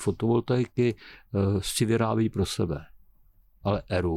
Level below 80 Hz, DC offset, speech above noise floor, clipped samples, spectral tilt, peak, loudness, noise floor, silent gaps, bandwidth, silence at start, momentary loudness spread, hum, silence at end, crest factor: -48 dBFS; under 0.1%; 33 dB; under 0.1%; -6 dB/octave; -14 dBFS; -27 LUFS; -59 dBFS; none; 15 kHz; 0 s; 8 LU; none; 0 s; 14 dB